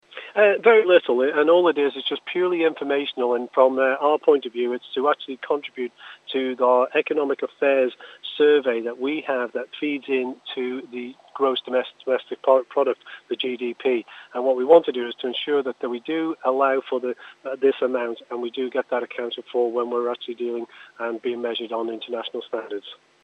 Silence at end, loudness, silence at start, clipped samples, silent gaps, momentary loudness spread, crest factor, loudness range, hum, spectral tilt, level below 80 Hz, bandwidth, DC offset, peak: 0.3 s; -23 LUFS; 0.15 s; under 0.1%; none; 13 LU; 20 dB; 6 LU; none; -5.5 dB/octave; -90 dBFS; 5.2 kHz; under 0.1%; -2 dBFS